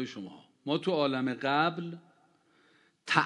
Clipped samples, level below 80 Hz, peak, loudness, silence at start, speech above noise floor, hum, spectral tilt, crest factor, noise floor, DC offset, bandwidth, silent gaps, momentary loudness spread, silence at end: under 0.1%; -82 dBFS; -8 dBFS; -30 LUFS; 0 s; 36 dB; none; -5.5 dB/octave; 26 dB; -67 dBFS; under 0.1%; 11 kHz; none; 19 LU; 0 s